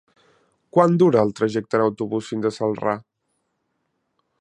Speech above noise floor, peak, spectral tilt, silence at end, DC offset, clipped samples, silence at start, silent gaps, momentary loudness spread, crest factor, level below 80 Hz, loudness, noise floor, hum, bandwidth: 54 dB; -2 dBFS; -7.5 dB/octave; 1.4 s; under 0.1%; under 0.1%; 0.75 s; none; 10 LU; 20 dB; -64 dBFS; -21 LUFS; -73 dBFS; none; 10.5 kHz